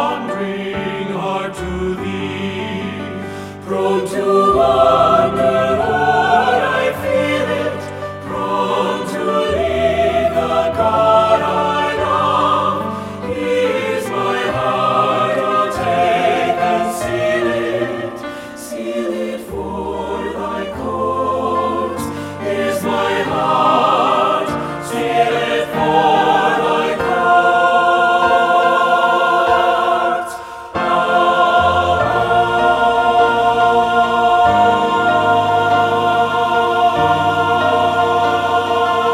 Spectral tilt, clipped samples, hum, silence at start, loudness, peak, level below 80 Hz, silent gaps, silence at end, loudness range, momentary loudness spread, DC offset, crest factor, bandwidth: -5 dB/octave; under 0.1%; none; 0 s; -15 LUFS; 0 dBFS; -42 dBFS; none; 0 s; 7 LU; 10 LU; under 0.1%; 14 dB; 15.5 kHz